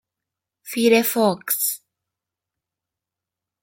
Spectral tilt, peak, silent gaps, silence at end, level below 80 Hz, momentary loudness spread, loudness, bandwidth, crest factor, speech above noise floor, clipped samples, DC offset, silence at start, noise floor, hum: -3.5 dB/octave; -4 dBFS; none; 1.85 s; -72 dBFS; 12 LU; -19 LUFS; 17 kHz; 20 dB; 68 dB; under 0.1%; under 0.1%; 0.65 s; -87 dBFS; none